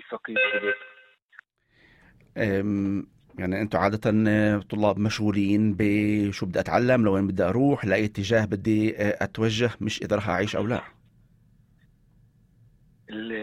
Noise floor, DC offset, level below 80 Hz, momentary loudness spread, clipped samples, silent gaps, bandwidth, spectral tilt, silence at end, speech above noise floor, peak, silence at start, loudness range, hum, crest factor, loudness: -62 dBFS; under 0.1%; -54 dBFS; 9 LU; under 0.1%; 1.22-1.29 s; 12.5 kHz; -6.5 dB/octave; 0 s; 38 dB; -8 dBFS; 0.1 s; 7 LU; none; 18 dB; -25 LUFS